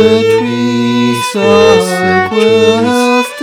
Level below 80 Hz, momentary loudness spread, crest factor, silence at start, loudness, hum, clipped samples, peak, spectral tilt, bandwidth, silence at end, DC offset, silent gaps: -48 dBFS; 5 LU; 10 dB; 0 s; -9 LUFS; none; 1%; 0 dBFS; -5 dB/octave; 15.5 kHz; 0 s; under 0.1%; none